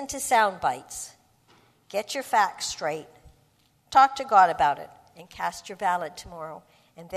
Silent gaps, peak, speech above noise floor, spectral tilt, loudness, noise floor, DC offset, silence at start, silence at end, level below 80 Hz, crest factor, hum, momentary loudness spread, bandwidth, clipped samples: none; -6 dBFS; 39 dB; -2 dB/octave; -24 LUFS; -64 dBFS; under 0.1%; 0 s; 0 s; -60 dBFS; 22 dB; none; 19 LU; 14 kHz; under 0.1%